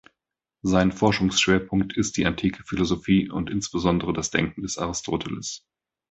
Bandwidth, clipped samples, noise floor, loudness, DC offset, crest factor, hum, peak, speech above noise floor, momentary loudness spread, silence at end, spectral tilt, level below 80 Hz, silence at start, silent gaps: 8.2 kHz; under 0.1%; -86 dBFS; -24 LUFS; under 0.1%; 20 dB; none; -4 dBFS; 62 dB; 9 LU; 0.55 s; -4.5 dB/octave; -44 dBFS; 0.65 s; none